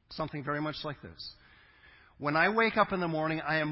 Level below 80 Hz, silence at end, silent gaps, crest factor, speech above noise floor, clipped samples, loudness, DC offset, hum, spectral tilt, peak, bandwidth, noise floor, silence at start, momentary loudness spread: -62 dBFS; 0 s; none; 20 dB; 28 dB; under 0.1%; -30 LUFS; under 0.1%; none; -9.5 dB/octave; -12 dBFS; 5.8 kHz; -59 dBFS; 0.1 s; 17 LU